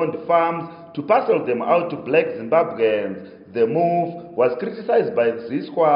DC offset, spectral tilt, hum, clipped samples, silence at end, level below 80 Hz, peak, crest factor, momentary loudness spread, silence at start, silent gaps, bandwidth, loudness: under 0.1%; -5 dB/octave; none; under 0.1%; 0 s; -70 dBFS; -4 dBFS; 16 dB; 10 LU; 0 s; none; 5.4 kHz; -20 LUFS